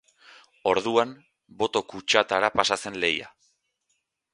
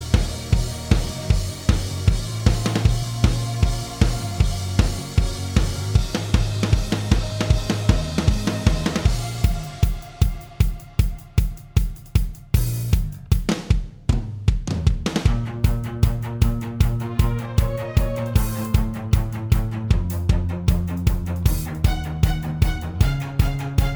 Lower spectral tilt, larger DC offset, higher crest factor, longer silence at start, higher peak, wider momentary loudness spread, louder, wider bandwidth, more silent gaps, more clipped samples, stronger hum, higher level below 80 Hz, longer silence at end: second, -2.5 dB/octave vs -6 dB/octave; neither; first, 26 dB vs 20 dB; first, 0.65 s vs 0 s; about the same, 0 dBFS vs 0 dBFS; first, 8 LU vs 3 LU; about the same, -25 LUFS vs -23 LUFS; second, 11.5 kHz vs over 20 kHz; neither; neither; neither; second, -62 dBFS vs -24 dBFS; first, 1.05 s vs 0 s